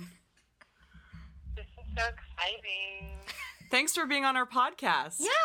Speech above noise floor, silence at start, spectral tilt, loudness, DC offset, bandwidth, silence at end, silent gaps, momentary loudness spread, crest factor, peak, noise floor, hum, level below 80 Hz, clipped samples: 34 dB; 0 s; -2 dB/octave; -30 LUFS; under 0.1%; 17 kHz; 0 s; none; 18 LU; 22 dB; -12 dBFS; -65 dBFS; none; -50 dBFS; under 0.1%